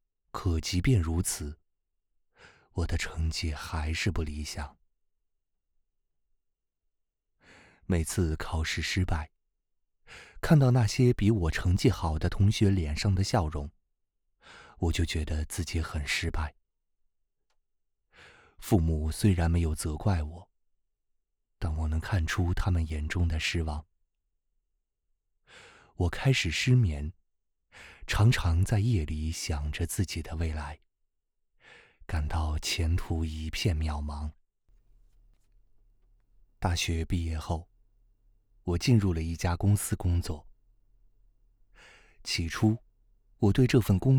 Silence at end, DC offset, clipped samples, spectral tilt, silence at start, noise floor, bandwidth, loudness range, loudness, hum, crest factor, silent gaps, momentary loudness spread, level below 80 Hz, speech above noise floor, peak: 0 s; under 0.1%; under 0.1%; -5.5 dB/octave; 0.35 s; -80 dBFS; 18 kHz; 8 LU; -29 LUFS; none; 22 dB; none; 13 LU; -40 dBFS; 53 dB; -8 dBFS